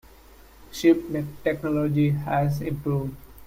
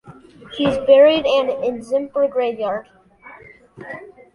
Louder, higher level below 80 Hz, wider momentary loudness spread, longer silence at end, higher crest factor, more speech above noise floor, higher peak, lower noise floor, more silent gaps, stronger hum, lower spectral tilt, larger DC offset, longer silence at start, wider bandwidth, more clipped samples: second, -25 LUFS vs -17 LUFS; about the same, -50 dBFS vs -54 dBFS; second, 9 LU vs 23 LU; second, 0 s vs 0.3 s; about the same, 18 dB vs 18 dB; about the same, 26 dB vs 26 dB; second, -6 dBFS vs -2 dBFS; first, -50 dBFS vs -44 dBFS; neither; neither; first, -7.5 dB/octave vs -5.5 dB/octave; neither; first, 0.6 s vs 0.05 s; first, 16 kHz vs 10.5 kHz; neither